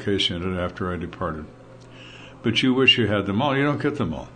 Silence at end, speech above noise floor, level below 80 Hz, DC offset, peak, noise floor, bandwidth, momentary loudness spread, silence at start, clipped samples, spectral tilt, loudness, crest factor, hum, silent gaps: 0 s; 21 dB; -48 dBFS; under 0.1%; -4 dBFS; -44 dBFS; 9.6 kHz; 22 LU; 0 s; under 0.1%; -5.5 dB/octave; -22 LUFS; 18 dB; none; none